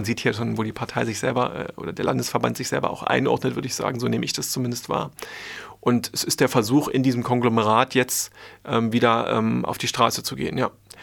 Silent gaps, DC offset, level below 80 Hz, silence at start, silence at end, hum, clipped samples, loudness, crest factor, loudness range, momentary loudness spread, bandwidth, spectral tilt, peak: none; under 0.1%; -58 dBFS; 0 s; 0 s; none; under 0.1%; -23 LUFS; 20 dB; 4 LU; 8 LU; 19.5 kHz; -4.5 dB/octave; -2 dBFS